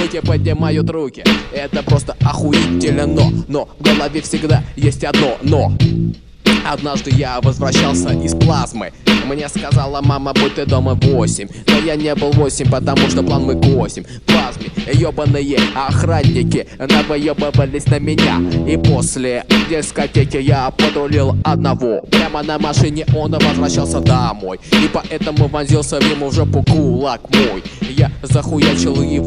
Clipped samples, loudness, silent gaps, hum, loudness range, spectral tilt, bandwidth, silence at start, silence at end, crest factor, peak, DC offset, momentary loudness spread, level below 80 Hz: under 0.1%; -15 LUFS; none; none; 1 LU; -5.5 dB/octave; 12.5 kHz; 0 s; 0 s; 14 dB; 0 dBFS; 0.2%; 5 LU; -30 dBFS